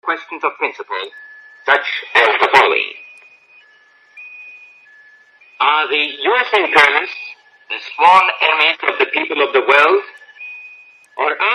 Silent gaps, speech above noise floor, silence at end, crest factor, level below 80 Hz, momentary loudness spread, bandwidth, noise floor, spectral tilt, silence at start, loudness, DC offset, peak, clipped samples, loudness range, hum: none; 35 dB; 0 s; 16 dB; -66 dBFS; 22 LU; 12.5 kHz; -50 dBFS; -2 dB/octave; 0.05 s; -14 LUFS; under 0.1%; 0 dBFS; under 0.1%; 6 LU; none